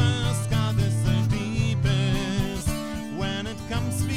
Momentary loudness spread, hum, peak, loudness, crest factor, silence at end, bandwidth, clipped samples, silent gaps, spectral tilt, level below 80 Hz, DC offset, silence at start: 7 LU; none; -10 dBFS; -26 LUFS; 14 dB; 0 s; 15.5 kHz; under 0.1%; none; -5.5 dB/octave; -36 dBFS; 0.5%; 0 s